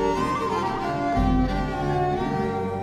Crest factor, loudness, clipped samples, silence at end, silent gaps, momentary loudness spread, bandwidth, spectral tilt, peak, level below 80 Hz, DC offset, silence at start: 14 dB; -25 LUFS; under 0.1%; 0 s; none; 4 LU; 13 kHz; -7 dB/octave; -10 dBFS; -34 dBFS; under 0.1%; 0 s